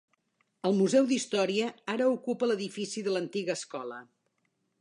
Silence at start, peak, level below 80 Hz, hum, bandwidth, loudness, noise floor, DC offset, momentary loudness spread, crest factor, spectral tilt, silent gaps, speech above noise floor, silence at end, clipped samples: 0.65 s; -14 dBFS; -84 dBFS; none; 11 kHz; -30 LUFS; -77 dBFS; under 0.1%; 12 LU; 18 dB; -4.5 dB/octave; none; 48 dB; 0.75 s; under 0.1%